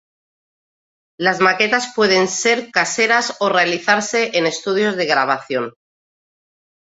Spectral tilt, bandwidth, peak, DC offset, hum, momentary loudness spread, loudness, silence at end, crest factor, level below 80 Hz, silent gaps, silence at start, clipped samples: -2.5 dB/octave; 8.2 kHz; 0 dBFS; under 0.1%; none; 5 LU; -16 LUFS; 1.15 s; 18 dB; -66 dBFS; none; 1.2 s; under 0.1%